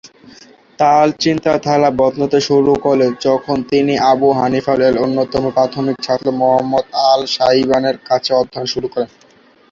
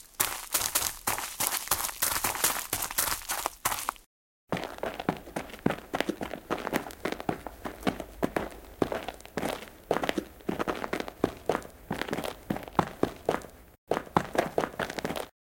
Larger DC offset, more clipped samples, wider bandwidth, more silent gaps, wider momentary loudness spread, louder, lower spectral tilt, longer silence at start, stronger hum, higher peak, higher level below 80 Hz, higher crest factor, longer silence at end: neither; neither; second, 7.6 kHz vs 17 kHz; second, none vs 4.06-4.47 s, 13.78-13.87 s; second, 5 LU vs 10 LU; first, -14 LUFS vs -31 LUFS; first, -5.5 dB/octave vs -3 dB/octave; about the same, 0.05 s vs 0 s; neither; first, 0 dBFS vs -4 dBFS; first, -48 dBFS vs -54 dBFS; second, 14 dB vs 30 dB; first, 0.65 s vs 0.25 s